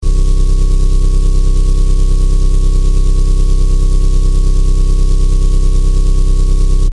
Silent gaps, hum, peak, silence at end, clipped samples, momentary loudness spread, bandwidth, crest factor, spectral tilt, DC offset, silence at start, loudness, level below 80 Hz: none; none; 0 dBFS; 0 s; under 0.1%; 0 LU; 10.5 kHz; 8 dB; -6.5 dB/octave; under 0.1%; 0 s; -15 LUFS; -8 dBFS